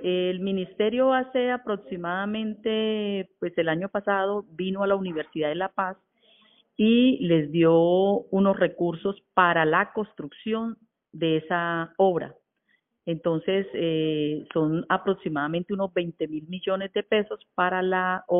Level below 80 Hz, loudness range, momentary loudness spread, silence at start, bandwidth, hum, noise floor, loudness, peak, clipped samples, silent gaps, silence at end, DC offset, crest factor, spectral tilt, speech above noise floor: -66 dBFS; 5 LU; 11 LU; 0 s; 3.9 kHz; none; -71 dBFS; -25 LUFS; -6 dBFS; under 0.1%; none; 0 s; under 0.1%; 20 dB; -4.5 dB/octave; 46 dB